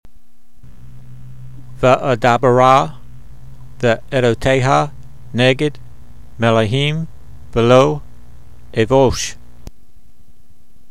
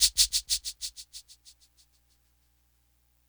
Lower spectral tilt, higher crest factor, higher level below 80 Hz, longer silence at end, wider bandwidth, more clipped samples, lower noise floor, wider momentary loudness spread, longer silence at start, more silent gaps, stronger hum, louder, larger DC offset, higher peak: first, -5.5 dB/octave vs 3.5 dB/octave; second, 18 dB vs 26 dB; first, -38 dBFS vs -54 dBFS; second, 1.55 s vs 2.1 s; second, 13.5 kHz vs over 20 kHz; neither; second, -53 dBFS vs -69 dBFS; second, 14 LU vs 23 LU; first, 0.8 s vs 0 s; neither; second, none vs 60 Hz at -70 dBFS; first, -15 LUFS vs -27 LUFS; first, 3% vs under 0.1%; first, 0 dBFS vs -8 dBFS